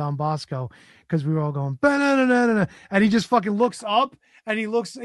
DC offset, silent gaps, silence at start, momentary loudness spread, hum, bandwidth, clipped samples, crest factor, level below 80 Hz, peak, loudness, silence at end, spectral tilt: under 0.1%; none; 0 s; 10 LU; none; 12 kHz; under 0.1%; 18 dB; -60 dBFS; -4 dBFS; -22 LUFS; 0 s; -6.5 dB/octave